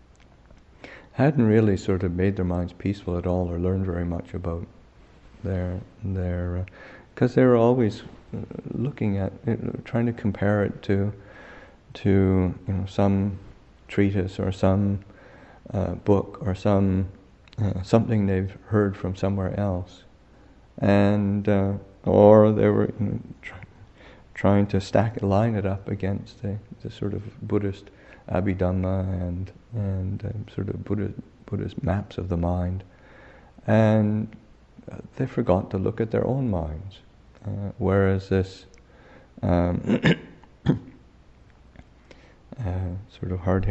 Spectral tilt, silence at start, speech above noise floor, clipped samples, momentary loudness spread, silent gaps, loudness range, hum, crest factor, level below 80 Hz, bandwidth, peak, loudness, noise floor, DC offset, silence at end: -9 dB/octave; 0.85 s; 29 dB; under 0.1%; 15 LU; none; 8 LU; none; 24 dB; -46 dBFS; 8.2 kHz; -2 dBFS; -24 LUFS; -53 dBFS; under 0.1%; 0 s